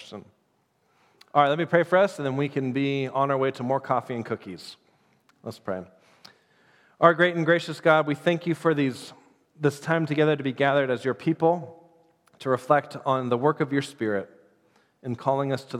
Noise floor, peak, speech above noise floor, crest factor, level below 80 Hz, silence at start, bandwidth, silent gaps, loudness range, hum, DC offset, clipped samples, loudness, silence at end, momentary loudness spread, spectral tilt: -69 dBFS; -2 dBFS; 45 dB; 24 dB; -78 dBFS; 0 s; 14 kHz; none; 5 LU; none; under 0.1%; under 0.1%; -25 LUFS; 0 s; 16 LU; -6.5 dB/octave